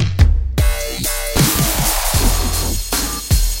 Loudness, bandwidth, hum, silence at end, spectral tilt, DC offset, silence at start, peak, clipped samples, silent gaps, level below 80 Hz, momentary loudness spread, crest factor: -17 LUFS; 17 kHz; none; 0 s; -3.5 dB/octave; under 0.1%; 0 s; 0 dBFS; under 0.1%; none; -18 dBFS; 5 LU; 14 dB